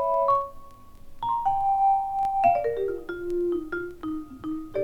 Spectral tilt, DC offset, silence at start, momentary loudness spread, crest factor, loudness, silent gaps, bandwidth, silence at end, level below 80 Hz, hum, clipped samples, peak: -7 dB/octave; under 0.1%; 0 s; 12 LU; 16 dB; -26 LUFS; none; 16 kHz; 0 s; -48 dBFS; none; under 0.1%; -10 dBFS